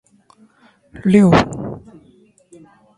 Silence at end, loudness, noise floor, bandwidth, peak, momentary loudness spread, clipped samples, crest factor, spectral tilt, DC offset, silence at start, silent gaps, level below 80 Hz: 1.2 s; -14 LUFS; -53 dBFS; 11 kHz; 0 dBFS; 20 LU; under 0.1%; 18 dB; -7.5 dB/octave; under 0.1%; 0.95 s; none; -42 dBFS